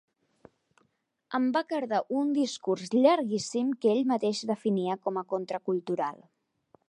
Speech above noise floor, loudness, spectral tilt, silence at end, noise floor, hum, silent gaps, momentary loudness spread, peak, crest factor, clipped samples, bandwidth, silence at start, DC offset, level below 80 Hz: 46 dB; -29 LUFS; -5.5 dB/octave; 0.75 s; -74 dBFS; none; none; 9 LU; -8 dBFS; 20 dB; under 0.1%; 11 kHz; 1.3 s; under 0.1%; -82 dBFS